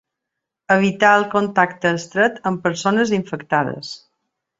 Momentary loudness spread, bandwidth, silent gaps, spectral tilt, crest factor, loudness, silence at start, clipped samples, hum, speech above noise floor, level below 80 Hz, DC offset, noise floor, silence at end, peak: 10 LU; 8 kHz; none; -5 dB/octave; 18 dB; -18 LUFS; 0.7 s; under 0.1%; none; 64 dB; -62 dBFS; under 0.1%; -82 dBFS; 0.6 s; -2 dBFS